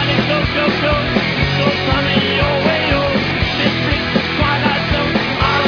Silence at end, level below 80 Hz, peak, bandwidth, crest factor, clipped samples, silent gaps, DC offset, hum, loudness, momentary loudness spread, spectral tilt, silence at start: 0 s; -30 dBFS; -2 dBFS; 5.4 kHz; 14 dB; under 0.1%; none; under 0.1%; none; -15 LUFS; 2 LU; -6 dB/octave; 0 s